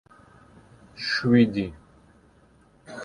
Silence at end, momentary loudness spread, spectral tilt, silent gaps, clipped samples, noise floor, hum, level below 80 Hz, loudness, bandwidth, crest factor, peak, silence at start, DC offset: 0 s; 16 LU; -6.5 dB/octave; none; under 0.1%; -58 dBFS; none; -56 dBFS; -23 LUFS; 10 kHz; 20 dB; -6 dBFS; 0.95 s; under 0.1%